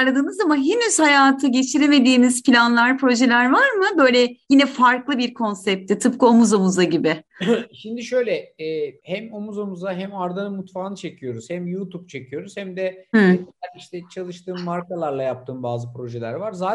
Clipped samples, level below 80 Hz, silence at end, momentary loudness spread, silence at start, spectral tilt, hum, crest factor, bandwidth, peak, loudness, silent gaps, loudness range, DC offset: under 0.1%; -68 dBFS; 0 s; 17 LU; 0 s; -4.5 dB/octave; none; 18 dB; 11.5 kHz; -2 dBFS; -18 LUFS; none; 13 LU; under 0.1%